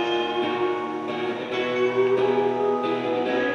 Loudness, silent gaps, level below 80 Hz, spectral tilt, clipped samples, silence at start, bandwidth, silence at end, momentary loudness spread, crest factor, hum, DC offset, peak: -24 LUFS; none; -66 dBFS; -5.5 dB/octave; under 0.1%; 0 s; 7.2 kHz; 0 s; 7 LU; 14 dB; none; under 0.1%; -10 dBFS